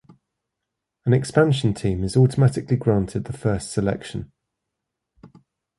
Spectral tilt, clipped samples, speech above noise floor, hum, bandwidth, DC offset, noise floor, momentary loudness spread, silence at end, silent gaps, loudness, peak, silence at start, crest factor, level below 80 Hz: -7 dB/octave; under 0.1%; 62 dB; none; 11.5 kHz; under 0.1%; -82 dBFS; 11 LU; 0.5 s; none; -21 LUFS; -4 dBFS; 1.05 s; 18 dB; -44 dBFS